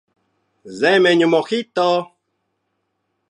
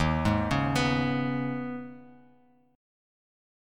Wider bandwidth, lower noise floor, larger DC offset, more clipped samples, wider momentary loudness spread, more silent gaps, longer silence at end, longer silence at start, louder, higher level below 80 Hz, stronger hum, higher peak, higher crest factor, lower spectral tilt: second, 10.5 kHz vs 14.5 kHz; first, -72 dBFS vs -62 dBFS; neither; neither; second, 9 LU vs 12 LU; neither; second, 1.25 s vs 1.55 s; first, 0.65 s vs 0 s; first, -16 LUFS vs -28 LUFS; second, -74 dBFS vs -44 dBFS; neither; first, -2 dBFS vs -12 dBFS; about the same, 18 dB vs 18 dB; about the same, -5 dB/octave vs -6 dB/octave